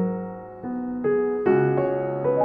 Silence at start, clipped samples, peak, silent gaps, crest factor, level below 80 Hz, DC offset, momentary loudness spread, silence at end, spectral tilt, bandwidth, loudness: 0 s; under 0.1%; -10 dBFS; none; 14 dB; -58 dBFS; under 0.1%; 12 LU; 0 s; -11.5 dB/octave; 3.2 kHz; -24 LUFS